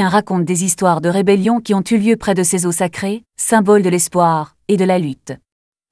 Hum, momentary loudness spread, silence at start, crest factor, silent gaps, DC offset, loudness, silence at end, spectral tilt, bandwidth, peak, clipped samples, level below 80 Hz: none; 10 LU; 0 s; 14 dB; none; under 0.1%; -15 LUFS; 0.55 s; -5 dB/octave; 11 kHz; 0 dBFS; under 0.1%; -52 dBFS